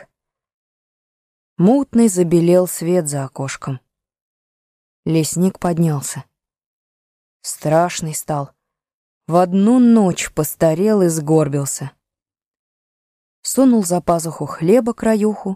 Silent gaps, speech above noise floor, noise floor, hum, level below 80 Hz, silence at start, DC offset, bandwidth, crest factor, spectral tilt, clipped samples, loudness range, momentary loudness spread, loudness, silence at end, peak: 4.21-5.03 s, 6.66-7.40 s, 8.94-9.21 s, 12.46-12.52 s, 12.59-13.43 s; 70 dB; -85 dBFS; none; -52 dBFS; 1.6 s; under 0.1%; 15.5 kHz; 16 dB; -6 dB/octave; under 0.1%; 6 LU; 13 LU; -16 LUFS; 0 s; -2 dBFS